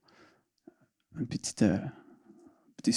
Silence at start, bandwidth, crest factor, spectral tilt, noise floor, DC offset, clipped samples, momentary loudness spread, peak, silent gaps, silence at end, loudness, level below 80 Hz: 1.15 s; 12 kHz; 22 dB; -5 dB/octave; -64 dBFS; under 0.1%; under 0.1%; 15 LU; -12 dBFS; none; 0 s; -32 LUFS; -66 dBFS